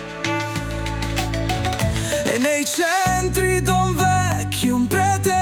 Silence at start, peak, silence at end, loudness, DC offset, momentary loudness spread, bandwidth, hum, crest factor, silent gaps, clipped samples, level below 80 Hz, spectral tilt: 0 s; -4 dBFS; 0 s; -20 LUFS; under 0.1%; 6 LU; 19 kHz; none; 16 dB; none; under 0.1%; -34 dBFS; -4.5 dB/octave